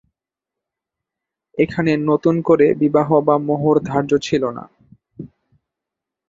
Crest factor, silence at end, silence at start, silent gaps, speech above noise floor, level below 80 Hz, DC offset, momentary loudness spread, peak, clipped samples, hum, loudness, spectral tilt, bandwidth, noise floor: 18 dB; 1.05 s; 1.55 s; none; 70 dB; -56 dBFS; under 0.1%; 18 LU; -2 dBFS; under 0.1%; none; -17 LUFS; -7.5 dB/octave; 7.6 kHz; -86 dBFS